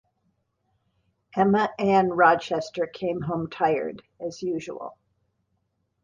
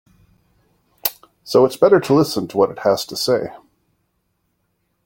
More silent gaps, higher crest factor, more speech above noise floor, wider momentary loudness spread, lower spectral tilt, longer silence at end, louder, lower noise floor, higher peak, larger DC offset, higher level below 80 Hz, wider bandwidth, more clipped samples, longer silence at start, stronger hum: neither; about the same, 22 dB vs 18 dB; about the same, 50 dB vs 53 dB; first, 17 LU vs 10 LU; first, -6.5 dB/octave vs -5 dB/octave; second, 1.15 s vs 1.55 s; second, -24 LUFS vs -17 LUFS; first, -74 dBFS vs -69 dBFS; about the same, -4 dBFS vs -2 dBFS; neither; second, -64 dBFS vs -58 dBFS; second, 7.6 kHz vs 17 kHz; neither; first, 1.35 s vs 1.05 s; neither